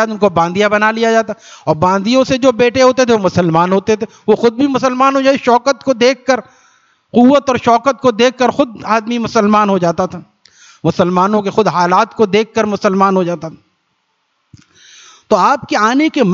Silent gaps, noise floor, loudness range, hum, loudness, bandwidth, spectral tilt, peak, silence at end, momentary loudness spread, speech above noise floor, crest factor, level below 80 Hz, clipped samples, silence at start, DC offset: none; -64 dBFS; 4 LU; none; -12 LUFS; 7.6 kHz; -5.5 dB/octave; 0 dBFS; 0 s; 6 LU; 52 dB; 12 dB; -52 dBFS; under 0.1%; 0 s; under 0.1%